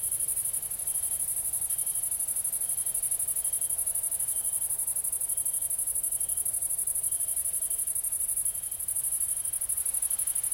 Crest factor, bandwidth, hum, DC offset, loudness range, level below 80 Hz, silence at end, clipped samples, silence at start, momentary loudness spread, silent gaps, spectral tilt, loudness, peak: 16 dB; 17 kHz; none; under 0.1%; 0 LU; -60 dBFS; 0 s; under 0.1%; 0 s; 1 LU; none; 0.5 dB/octave; -27 LUFS; -14 dBFS